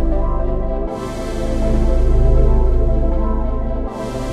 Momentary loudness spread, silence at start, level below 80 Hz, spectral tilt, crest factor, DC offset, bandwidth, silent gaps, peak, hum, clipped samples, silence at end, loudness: 9 LU; 0 s; -16 dBFS; -8 dB/octave; 12 dB; under 0.1%; 9 kHz; none; -2 dBFS; none; under 0.1%; 0 s; -20 LUFS